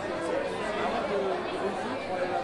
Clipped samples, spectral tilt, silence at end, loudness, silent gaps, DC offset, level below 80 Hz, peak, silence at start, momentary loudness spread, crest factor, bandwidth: under 0.1%; -5 dB/octave; 0 s; -31 LUFS; none; under 0.1%; -58 dBFS; -18 dBFS; 0 s; 2 LU; 12 dB; 11.5 kHz